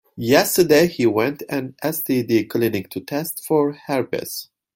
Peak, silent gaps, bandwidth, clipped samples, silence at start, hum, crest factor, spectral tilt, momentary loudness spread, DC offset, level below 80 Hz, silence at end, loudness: -2 dBFS; none; 17 kHz; under 0.1%; 0.15 s; none; 18 dB; -4.5 dB/octave; 12 LU; under 0.1%; -58 dBFS; 0.3 s; -20 LUFS